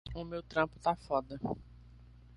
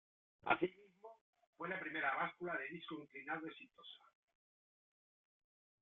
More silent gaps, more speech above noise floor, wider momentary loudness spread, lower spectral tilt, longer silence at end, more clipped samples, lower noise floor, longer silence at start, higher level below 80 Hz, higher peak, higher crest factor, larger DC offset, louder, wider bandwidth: second, none vs 1.21-1.33 s, 1.47-1.53 s; second, 20 dB vs over 46 dB; second, 9 LU vs 23 LU; first, -7 dB/octave vs -2.5 dB/octave; second, 0 s vs 1.85 s; neither; second, -56 dBFS vs under -90 dBFS; second, 0.05 s vs 0.45 s; first, -54 dBFS vs -82 dBFS; about the same, -16 dBFS vs -18 dBFS; second, 22 dB vs 28 dB; neither; first, -36 LUFS vs -43 LUFS; first, 11.5 kHz vs 4.2 kHz